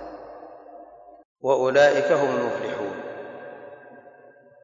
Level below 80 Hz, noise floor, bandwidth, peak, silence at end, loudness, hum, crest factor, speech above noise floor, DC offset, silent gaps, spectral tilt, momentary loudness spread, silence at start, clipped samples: -68 dBFS; -51 dBFS; 7.6 kHz; -8 dBFS; 0.65 s; -22 LUFS; none; 18 dB; 30 dB; under 0.1%; 1.25-1.36 s; -4.5 dB/octave; 26 LU; 0 s; under 0.1%